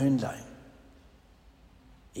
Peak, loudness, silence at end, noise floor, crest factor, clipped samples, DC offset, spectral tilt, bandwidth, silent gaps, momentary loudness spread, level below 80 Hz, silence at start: -16 dBFS; -33 LUFS; 0 s; -58 dBFS; 18 dB; under 0.1%; under 0.1%; -7 dB/octave; 15.5 kHz; none; 28 LU; -58 dBFS; 0 s